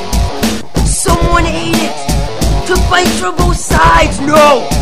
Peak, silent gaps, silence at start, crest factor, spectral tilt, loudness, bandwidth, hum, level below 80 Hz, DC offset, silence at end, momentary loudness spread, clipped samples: 0 dBFS; none; 0 s; 12 dB; -4.5 dB/octave; -11 LUFS; 16.5 kHz; none; -16 dBFS; 8%; 0 s; 8 LU; 0.4%